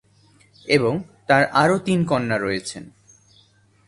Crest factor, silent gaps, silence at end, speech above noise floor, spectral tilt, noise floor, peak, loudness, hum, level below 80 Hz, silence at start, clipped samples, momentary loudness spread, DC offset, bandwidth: 22 dB; none; 1 s; 37 dB; -5.5 dB/octave; -57 dBFS; 0 dBFS; -20 LUFS; none; -56 dBFS; 0.65 s; under 0.1%; 15 LU; under 0.1%; 11.5 kHz